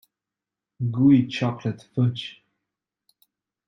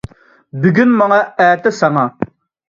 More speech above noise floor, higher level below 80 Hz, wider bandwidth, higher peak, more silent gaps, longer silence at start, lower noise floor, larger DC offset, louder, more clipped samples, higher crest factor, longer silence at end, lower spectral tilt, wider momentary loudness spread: first, 66 dB vs 22 dB; second, -64 dBFS vs -50 dBFS; about the same, 7.4 kHz vs 7.6 kHz; second, -6 dBFS vs 0 dBFS; neither; first, 0.8 s vs 0.55 s; first, -88 dBFS vs -34 dBFS; neither; second, -23 LUFS vs -13 LUFS; neither; about the same, 18 dB vs 14 dB; first, 1.35 s vs 0.45 s; about the same, -8 dB/octave vs -7 dB/octave; about the same, 14 LU vs 15 LU